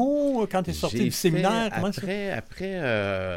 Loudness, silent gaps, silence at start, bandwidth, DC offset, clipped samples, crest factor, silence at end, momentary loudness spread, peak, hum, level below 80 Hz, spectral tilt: -26 LUFS; none; 0 s; 16.5 kHz; under 0.1%; under 0.1%; 18 dB; 0 s; 7 LU; -8 dBFS; none; -50 dBFS; -5.5 dB/octave